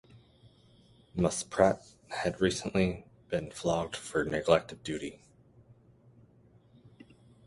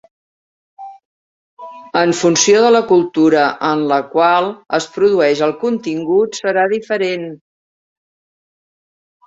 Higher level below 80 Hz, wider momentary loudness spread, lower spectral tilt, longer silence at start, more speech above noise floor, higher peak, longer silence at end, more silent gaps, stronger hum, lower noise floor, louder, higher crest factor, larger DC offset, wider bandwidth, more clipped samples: first, -56 dBFS vs -62 dBFS; first, 12 LU vs 9 LU; about the same, -5 dB/octave vs -4 dB/octave; second, 0.15 s vs 0.8 s; second, 31 dB vs over 76 dB; second, -8 dBFS vs 0 dBFS; first, 2.3 s vs 1.9 s; second, none vs 1.05-1.57 s; neither; second, -61 dBFS vs under -90 dBFS; second, -31 LUFS vs -14 LUFS; first, 26 dB vs 16 dB; neither; first, 11.5 kHz vs 8 kHz; neither